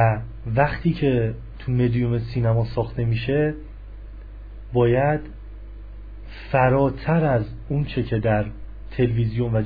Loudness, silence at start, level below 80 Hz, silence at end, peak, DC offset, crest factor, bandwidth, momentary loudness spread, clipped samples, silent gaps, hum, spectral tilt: -22 LUFS; 0 s; -36 dBFS; 0 s; -6 dBFS; 0.3%; 16 dB; 5 kHz; 22 LU; under 0.1%; none; none; -11 dB/octave